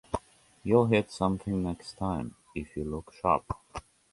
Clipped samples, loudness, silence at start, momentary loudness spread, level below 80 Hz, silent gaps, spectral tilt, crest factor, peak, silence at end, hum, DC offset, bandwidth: under 0.1%; -30 LUFS; 0.1 s; 15 LU; -50 dBFS; none; -7 dB/octave; 22 dB; -8 dBFS; 0.3 s; none; under 0.1%; 11.5 kHz